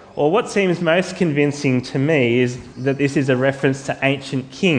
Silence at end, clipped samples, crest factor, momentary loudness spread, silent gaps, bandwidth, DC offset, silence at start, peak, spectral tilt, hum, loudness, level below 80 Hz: 0 s; under 0.1%; 18 dB; 5 LU; none; 10 kHz; under 0.1%; 0 s; -2 dBFS; -6 dB/octave; none; -19 LUFS; -56 dBFS